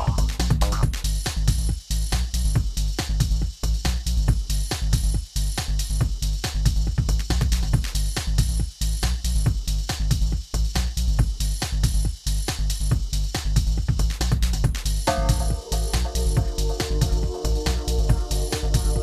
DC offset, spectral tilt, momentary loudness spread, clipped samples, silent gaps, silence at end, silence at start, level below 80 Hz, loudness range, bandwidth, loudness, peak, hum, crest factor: under 0.1%; -4.5 dB/octave; 3 LU; under 0.1%; none; 0 s; 0 s; -24 dBFS; 1 LU; 14 kHz; -25 LUFS; -6 dBFS; none; 16 dB